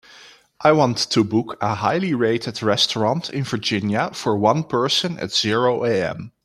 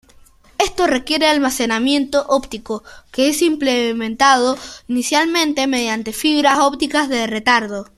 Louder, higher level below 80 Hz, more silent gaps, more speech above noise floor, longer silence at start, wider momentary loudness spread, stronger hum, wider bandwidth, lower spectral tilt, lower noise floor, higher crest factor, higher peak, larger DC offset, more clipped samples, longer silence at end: second, -20 LUFS vs -16 LUFS; second, -60 dBFS vs -46 dBFS; neither; second, 27 dB vs 31 dB; second, 0.2 s vs 0.6 s; second, 5 LU vs 9 LU; neither; about the same, 14 kHz vs 15 kHz; first, -4.5 dB/octave vs -2 dB/octave; about the same, -47 dBFS vs -48 dBFS; about the same, 18 dB vs 16 dB; about the same, -2 dBFS vs 0 dBFS; neither; neither; about the same, 0.15 s vs 0.15 s